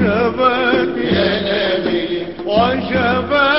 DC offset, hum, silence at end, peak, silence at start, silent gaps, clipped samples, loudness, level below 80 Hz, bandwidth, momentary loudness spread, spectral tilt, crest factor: 0.6%; none; 0 s; -2 dBFS; 0 s; none; under 0.1%; -16 LUFS; -38 dBFS; 5.8 kHz; 4 LU; -10 dB/octave; 14 dB